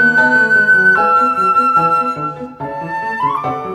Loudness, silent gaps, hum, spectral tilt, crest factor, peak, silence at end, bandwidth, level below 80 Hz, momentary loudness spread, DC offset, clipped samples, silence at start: -12 LUFS; none; none; -5.5 dB/octave; 12 dB; -2 dBFS; 0 s; 12.5 kHz; -52 dBFS; 14 LU; under 0.1%; under 0.1%; 0 s